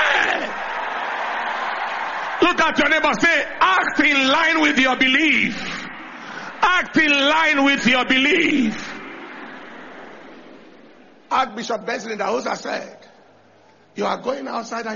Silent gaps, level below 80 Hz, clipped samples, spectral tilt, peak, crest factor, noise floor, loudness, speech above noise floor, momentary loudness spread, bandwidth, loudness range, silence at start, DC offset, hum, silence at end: none; -54 dBFS; under 0.1%; -0.5 dB/octave; -2 dBFS; 18 dB; -52 dBFS; -18 LUFS; 34 dB; 19 LU; 7.2 kHz; 11 LU; 0 s; under 0.1%; none; 0 s